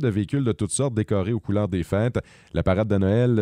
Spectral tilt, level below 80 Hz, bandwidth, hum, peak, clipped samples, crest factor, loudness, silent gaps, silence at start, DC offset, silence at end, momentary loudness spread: -6.5 dB/octave; -44 dBFS; 11.5 kHz; none; -8 dBFS; under 0.1%; 14 dB; -24 LUFS; none; 0 s; under 0.1%; 0 s; 6 LU